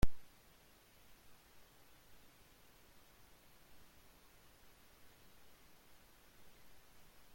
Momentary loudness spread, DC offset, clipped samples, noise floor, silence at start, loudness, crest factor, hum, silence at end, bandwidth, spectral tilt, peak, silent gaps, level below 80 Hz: 0 LU; under 0.1%; under 0.1%; -66 dBFS; 0.05 s; -61 LUFS; 26 dB; none; 7.15 s; 16.5 kHz; -5.5 dB/octave; -18 dBFS; none; -54 dBFS